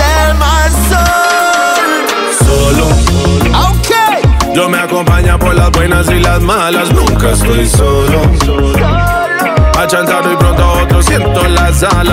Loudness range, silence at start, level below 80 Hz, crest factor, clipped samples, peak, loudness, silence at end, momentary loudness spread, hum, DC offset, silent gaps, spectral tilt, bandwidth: 1 LU; 0 s; -12 dBFS; 8 dB; under 0.1%; 0 dBFS; -9 LUFS; 0 s; 2 LU; none; under 0.1%; none; -5 dB/octave; 16.5 kHz